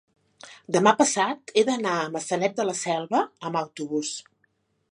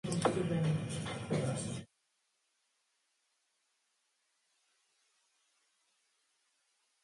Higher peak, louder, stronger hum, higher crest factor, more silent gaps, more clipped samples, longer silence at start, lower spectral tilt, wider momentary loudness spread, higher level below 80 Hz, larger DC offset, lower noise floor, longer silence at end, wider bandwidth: first, -4 dBFS vs -18 dBFS; first, -25 LUFS vs -36 LUFS; neither; about the same, 22 dB vs 24 dB; neither; neither; first, 0.45 s vs 0.05 s; second, -3.5 dB/octave vs -6 dB/octave; about the same, 9 LU vs 8 LU; second, -76 dBFS vs -66 dBFS; neither; second, -70 dBFS vs -80 dBFS; second, 0.7 s vs 5.2 s; about the same, 11.5 kHz vs 11.5 kHz